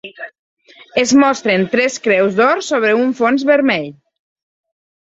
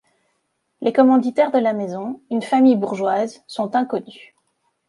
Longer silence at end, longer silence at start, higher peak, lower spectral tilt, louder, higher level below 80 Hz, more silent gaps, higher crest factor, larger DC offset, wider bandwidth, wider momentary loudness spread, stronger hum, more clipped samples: first, 1.15 s vs 0.75 s; second, 0.05 s vs 0.8 s; about the same, -2 dBFS vs -2 dBFS; second, -4 dB/octave vs -6.5 dB/octave; first, -14 LUFS vs -19 LUFS; first, -60 dBFS vs -72 dBFS; first, 0.39-0.57 s vs none; about the same, 14 dB vs 16 dB; neither; second, 8 kHz vs 11 kHz; about the same, 14 LU vs 12 LU; neither; neither